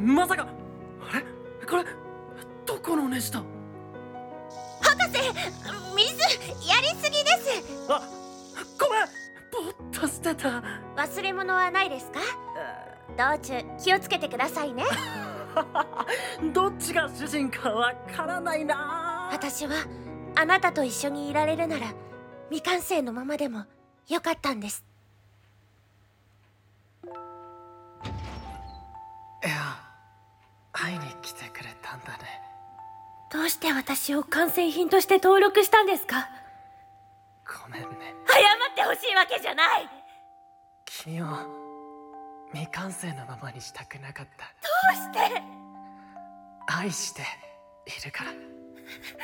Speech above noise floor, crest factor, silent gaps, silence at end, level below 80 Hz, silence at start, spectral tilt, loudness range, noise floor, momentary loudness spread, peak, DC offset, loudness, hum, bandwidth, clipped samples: 35 dB; 22 dB; none; 0 s; -58 dBFS; 0 s; -3 dB/octave; 14 LU; -62 dBFS; 22 LU; -6 dBFS; under 0.1%; -26 LUFS; none; 17.5 kHz; under 0.1%